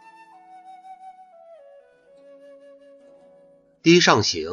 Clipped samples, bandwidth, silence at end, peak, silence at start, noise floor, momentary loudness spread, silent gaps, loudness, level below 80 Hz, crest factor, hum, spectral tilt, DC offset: under 0.1%; 7.4 kHz; 0 s; -2 dBFS; 0.9 s; -55 dBFS; 29 LU; none; -17 LUFS; -64 dBFS; 24 dB; none; -4 dB/octave; under 0.1%